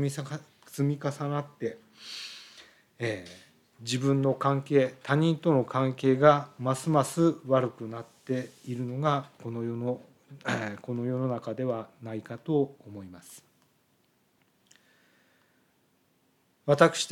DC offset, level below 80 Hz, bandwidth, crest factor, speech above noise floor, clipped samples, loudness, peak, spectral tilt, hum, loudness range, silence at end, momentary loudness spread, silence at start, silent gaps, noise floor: under 0.1%; -80 dBFS; 14.5 kHz; 24 dB; 41 dB; under 0.1%; -29 LUFS; -6 dBFS; -6 dB/octave; none; 10 LU; 0 s; 18 LU; 0 s; none; -69 dBFS